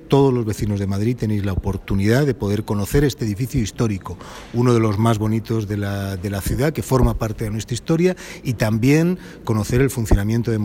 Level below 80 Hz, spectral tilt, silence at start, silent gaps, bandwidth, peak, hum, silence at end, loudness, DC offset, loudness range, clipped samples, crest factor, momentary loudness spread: -32 dBFS; -7 dB/octave; 0 s; none; 16.5 kHz; -2 dBFS; none; 0 s; -20 LUFS; under 0.1%; 2 LU; under 0.1%; 18 dB; 8 LU